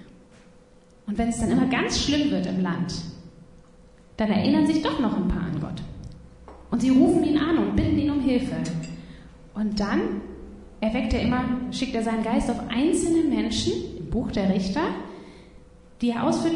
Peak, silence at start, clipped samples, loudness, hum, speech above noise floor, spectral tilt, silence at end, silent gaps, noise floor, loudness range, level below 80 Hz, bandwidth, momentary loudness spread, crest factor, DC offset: -6 dBFS; 0 s; under 0.1%; -24 LUFS; none; 30 dB; -5.5 dB/octave; 0 s; none; -53 dBFS; 4 LU; -42 dBFS; 11 kHz; 17 LU; 18 dB; under 0.1%